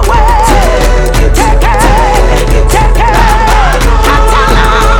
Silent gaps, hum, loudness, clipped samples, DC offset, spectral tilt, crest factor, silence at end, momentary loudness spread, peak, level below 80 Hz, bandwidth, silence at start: none; none; -8 LUFS; 2%; under 0.1%; -4.5 dB/octave; 6 dB; 0 s; 2 LU; 0 dBFS; -8 dBFS; 16.5 kHz; 0 s